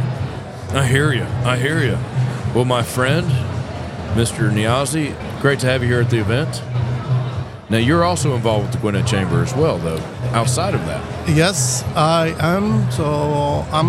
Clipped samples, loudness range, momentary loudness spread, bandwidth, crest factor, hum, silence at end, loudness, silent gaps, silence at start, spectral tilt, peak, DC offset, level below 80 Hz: under 0.1%; 1 LU; 8 LU; 15 kHz; 16 dB; none; 0 s; -18 LUFS; none; 0 s; -5.5 dB/octave; -2 dBFS; under 0.1%; -42 dBFS